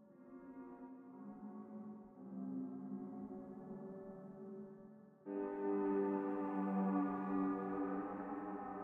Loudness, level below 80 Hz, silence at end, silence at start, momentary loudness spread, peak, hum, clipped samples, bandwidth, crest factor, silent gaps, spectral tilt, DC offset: -43 LUFS; -78 dBFS; 0 s; 0 s; 17 LU; -26 dBFS; none; under 0.1%; 3.4 kHz; 16 dB; none; -11 dB/octave; under 0.1%